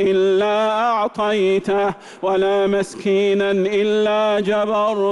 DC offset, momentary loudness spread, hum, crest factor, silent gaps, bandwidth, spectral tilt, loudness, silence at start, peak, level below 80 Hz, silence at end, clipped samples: under 0.1%; 3 LU; none; 8 dB; none; 11.5 kHz; -5.5 dB/octave; -18 LUFS; 0 s; -10 dBFS; -56 dBFS; 0 s; under 0.1%